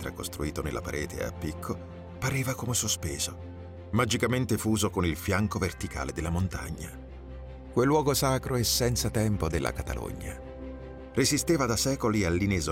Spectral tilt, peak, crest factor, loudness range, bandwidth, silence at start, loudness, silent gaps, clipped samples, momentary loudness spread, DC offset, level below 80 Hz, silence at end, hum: -4.5 dB/octave; -12 dBFS; 16 dB; 4 LU; 16.5 kHz; 0 s; -29 LUFS; none; under 0.1%; 17 LU; under 0.1%; -44 dBFS; 0 s; none